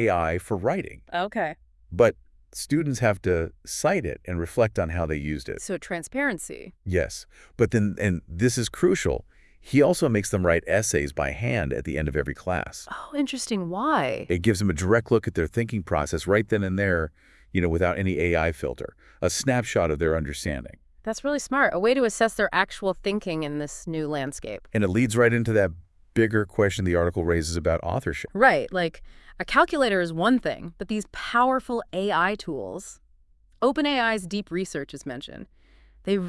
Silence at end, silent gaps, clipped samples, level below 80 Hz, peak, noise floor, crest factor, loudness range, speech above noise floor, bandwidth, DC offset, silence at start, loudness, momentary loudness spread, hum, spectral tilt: 0 s; none; under 0.1%; -46 dBFS; -4 dBFS; -58 dBFS; 20 dB; 4 LU; 34 dB; 12 kHz; under 0.1%; 0 s; -25 LUFS; 11 LU; none; -5.5 dB/octave